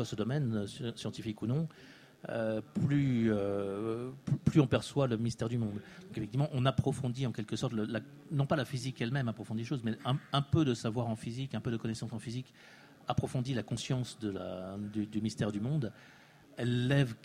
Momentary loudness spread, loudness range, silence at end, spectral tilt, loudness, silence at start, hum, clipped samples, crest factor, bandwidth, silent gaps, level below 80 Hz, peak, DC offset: 11 LU; 5 LU; 0.1 s; -6.5 dB/octave; -35 LUFS; 0 s; none; under 0.1%; 20 dB; 12 kHz; none; -60 dBFS; -14 dBFS; under 0.1%